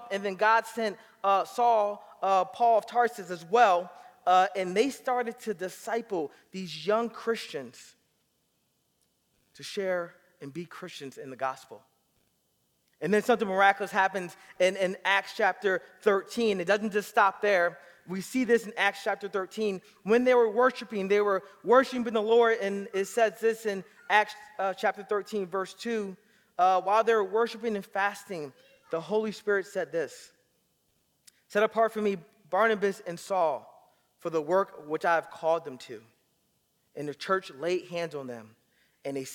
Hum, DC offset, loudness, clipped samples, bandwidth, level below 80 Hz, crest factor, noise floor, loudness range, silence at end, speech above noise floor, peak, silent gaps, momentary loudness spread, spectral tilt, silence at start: none; under 0.1%; -28 LUFS; under 0.1%; 17.5 kHz; -78 dBFS; 22 dB; -74 dBFS; 10 LU; 0 s; 46 dB; -8 dBFS; none; 16 LU; -4.5 dB/octave; 0 s